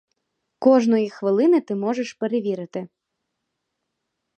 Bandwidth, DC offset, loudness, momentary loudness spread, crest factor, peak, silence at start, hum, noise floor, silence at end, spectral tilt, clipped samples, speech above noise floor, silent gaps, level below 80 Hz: 8.8 kHz; under 0.1%; -21 LUFS; 11 LU; 18 dB; -4 dBFS; 0.6 s; none; -79 dBFS; 1.5 s; -7 dB/octave; under 0.1%; 59 dB; none; -78 dBFS